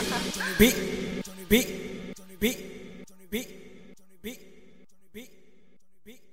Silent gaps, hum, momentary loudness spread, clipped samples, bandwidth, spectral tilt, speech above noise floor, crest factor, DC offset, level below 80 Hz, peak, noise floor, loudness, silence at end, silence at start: none; none; 26 LU; under 0.1%; 16 kHz; -3.5 dB/octave; 40 dB; 26 dB; 0.3%; -46 dBFS; -6 dBFS; -65 dBFS; -27 LUFS; 0.2 s; 0 s